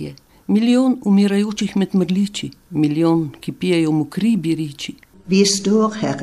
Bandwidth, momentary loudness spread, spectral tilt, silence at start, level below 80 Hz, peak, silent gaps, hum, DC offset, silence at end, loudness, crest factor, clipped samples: 12.5 kHz; 12 LU; -5.5 dB/octave; 0 s; -56 dBFS; -2 dBFS; none; none; under 0.1%; 0 s; -18 LUFS; 16 dB; under 0.1%